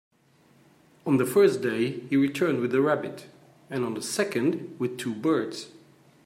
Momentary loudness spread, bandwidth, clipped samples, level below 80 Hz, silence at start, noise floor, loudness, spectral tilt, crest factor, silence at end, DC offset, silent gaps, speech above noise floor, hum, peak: 15 LU; 16 kHz; under 0.1%; -74 dBFS; 1.05 s; -61 dBFS; -26 LUFS; -5.5 dB/octave; 18 dB; 0.55 s; under 0.1%; none; 35 dB; none; -8 dBFS